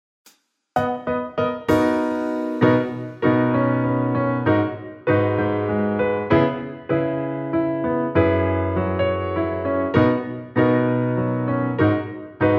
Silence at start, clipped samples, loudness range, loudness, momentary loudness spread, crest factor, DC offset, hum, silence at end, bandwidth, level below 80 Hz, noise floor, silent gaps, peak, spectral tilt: 0.75 s; under 0.1%; 1 LU; -21 LUFS; 7 LU; 18 dB; under 0.1%; none; 0 s; 8.2 kHz; -50 dBFS; -57 dBFS; none; -4 dBFS; -8.5 dB/octave